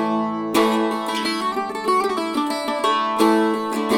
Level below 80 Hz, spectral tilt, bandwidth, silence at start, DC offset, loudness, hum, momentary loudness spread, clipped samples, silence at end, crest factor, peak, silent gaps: -62 dBFS; -4 dB/octave; 17.5 kHz; 0 s; under 0.1%; -20 LUFS; none; 6 LU; under 0.1%; 0 s; 18 dB; -2 dBFS; none